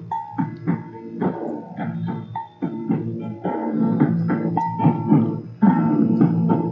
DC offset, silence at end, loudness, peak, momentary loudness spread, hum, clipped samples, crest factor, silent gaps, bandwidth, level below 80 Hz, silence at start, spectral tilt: under 0.1%; 0 s; -22 LUFS; -4 dBFS; 12 LU; none; under 0.1%; 18 dB; none; 5.2 kHz; -62 dBFS; 0 s; -11.5 dB/octave